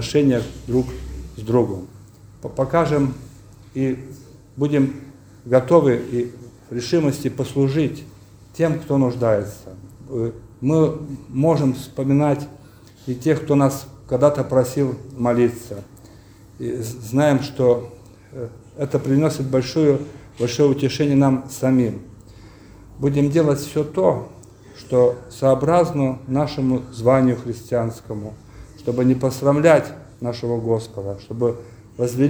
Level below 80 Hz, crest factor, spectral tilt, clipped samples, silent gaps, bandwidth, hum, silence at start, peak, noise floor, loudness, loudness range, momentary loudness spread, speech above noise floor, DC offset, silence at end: -46 dBFS; 20 dB; -7 dB/octave; under 0.1%; none; over 20 kHz; none; 0 s; 0 dBFS; -45 dBFS; -20 LUFS; 3 LU; 17 LU; 26 dB; under 0.1%; 0 s